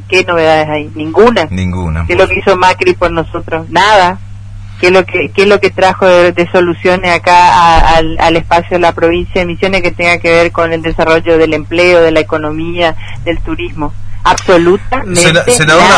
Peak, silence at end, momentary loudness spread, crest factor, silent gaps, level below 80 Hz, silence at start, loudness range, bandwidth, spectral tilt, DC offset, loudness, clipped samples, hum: 0 dBFS; 0 s; 11 LU; 8 dB; none; -24 dBFS; 0 s; 3 LU; 11 kHz; -4.5 dB/octave; under 0.1%; -9 LUFS; 2%; none